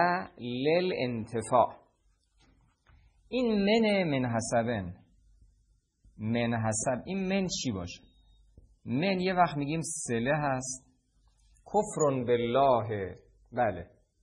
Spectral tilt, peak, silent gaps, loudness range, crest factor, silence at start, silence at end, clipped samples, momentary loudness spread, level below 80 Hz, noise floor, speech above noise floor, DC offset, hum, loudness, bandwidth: -5 dB/octave; -12 dBFS; none; 3 LU; 20 dB; 0 s; 0.4 s; under 0.1%; 13 LU; -60 dBFS; -70 dBFS; 41 dB; under 0.1%; none; -30 LUFS; 11 kHz